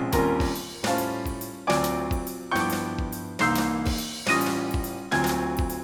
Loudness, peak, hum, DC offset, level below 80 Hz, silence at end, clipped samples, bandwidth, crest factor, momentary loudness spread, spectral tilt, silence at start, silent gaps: -26 LUFS; -10 dBFS; none; under 0.1%; -38 dBFS; 0 s; under 0.1%; 19 kHz; 16 dB; 7 LU; -4.5 dB/octave; 0 s; none